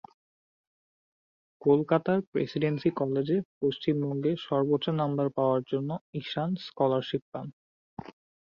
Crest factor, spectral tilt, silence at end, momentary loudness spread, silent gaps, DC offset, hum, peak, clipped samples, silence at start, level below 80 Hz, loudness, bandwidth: 20 dB; -9 dB/octave; 0.35 s; 13 LU; 2.27-2.32 s, 3.45-3.61 s, 6.01-6.13 s, 7.22-7.32 s, 7.53-7.97 s; under 0.1%; none; -10 dBFS; under 0.1%; 1.6 s; -68 dBFS; -29 LUFS; 7 kHz